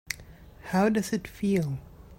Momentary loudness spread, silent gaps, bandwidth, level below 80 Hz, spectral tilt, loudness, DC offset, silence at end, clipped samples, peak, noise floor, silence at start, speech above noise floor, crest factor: 14 LU; none; 16.5 kHz; -52 dBFS; -6 dB/octave; -28 LUFS; under 0.1%; 0.05 s; under 0.1%; -8 dBFS; -49 dBFS; 0.1 s; 22 dB; 20 dB